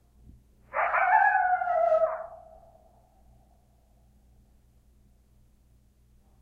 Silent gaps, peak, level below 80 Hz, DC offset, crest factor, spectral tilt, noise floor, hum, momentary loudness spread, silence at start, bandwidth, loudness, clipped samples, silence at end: none; -10 dBFS; -62 dBFS; under 0.1%; 22 dB; -5 dB/octave; -62 dBFS; none; 14 LU; 0.75 s; 4.9 kHz; -25 LUFS; under 0.1%; 4.05 s